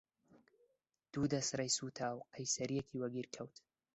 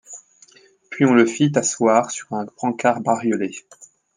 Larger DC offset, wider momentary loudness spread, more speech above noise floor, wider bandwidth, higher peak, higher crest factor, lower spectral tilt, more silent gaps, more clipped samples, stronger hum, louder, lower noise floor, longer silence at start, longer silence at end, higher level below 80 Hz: neither; second, 11 LU vs 20 LU; first, 40 dB vs 33 dB; second, 8.2 kHz vs 9.8 kHz; second, -22 dBFS vs -2 dBFS; about the same, 20 dB vs 18 dB; second, -3.5 dB/octave vs -5 dB/octave; neither; neither; neither; second, -40 LUFS vs -19 LUFS; first, -80 dBFS vs -52 dBFS; first, 0.35 s vs 0.1 s; first, 0.45 s vs 0.3 s; about the same, -74 dBFS vs -70 dBFS